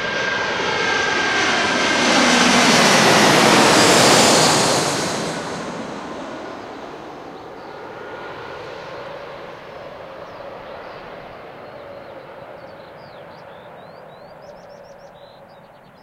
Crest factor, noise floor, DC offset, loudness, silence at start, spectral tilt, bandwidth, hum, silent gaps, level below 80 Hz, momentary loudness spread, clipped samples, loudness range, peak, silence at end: 20 dB; -45 dBFS; under 0.1%; -14 LUFS; 0 s; -2.5 dB/octave; 16 kHz; none; none; -54 dBFS; 25 LU; under 0.1%; 24 LU; 0 dBFS; 0.95 s